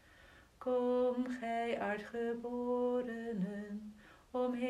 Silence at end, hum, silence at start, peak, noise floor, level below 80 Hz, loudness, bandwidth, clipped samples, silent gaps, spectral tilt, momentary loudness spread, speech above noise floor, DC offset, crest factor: 0 s; none; 0.2 s; -24 dBFS; -62 dBFS; -70 dBFS; -38 LUFS; 11 kHz; under 0.1%; none; -7 dB/octave; 11 LU; 25 dB; under 0.1%; 12 dB